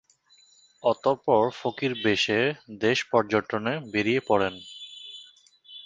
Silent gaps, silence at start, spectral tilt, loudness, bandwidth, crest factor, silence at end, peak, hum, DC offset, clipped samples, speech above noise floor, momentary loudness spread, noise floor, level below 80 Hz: none; 0.85 s; -5 dB/octave; -25 LUFS; 9.6 kHz; 20 dB; 0.05 s; -6 dBFS; none; under 0.1%; under 0.1%; 35 dB; 17 LU; -60 dBFS; -62 dBFS